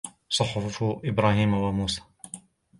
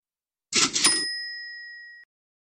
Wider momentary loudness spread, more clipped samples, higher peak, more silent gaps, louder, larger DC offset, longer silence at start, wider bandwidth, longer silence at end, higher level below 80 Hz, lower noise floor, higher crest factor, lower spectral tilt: about the same, 19 LU vs 21 LU; neither; about the same, -8 dBFS vs -6 dBFS; neither; second, -26 LUFS vs -22 LUFS; neither; second, 0.05 s vs 0.5 s; second, 11.5 kHz vs 15.5 kHz; about the same, 0.4 s vs 0.35 s; first, -48 dBFS vs -68 dBFS; second, -47 dBFS vs under -90 dBFS; about the same, 20 dB vs 22 dB; first, -5 dB/octave vs 0.5 dB/octave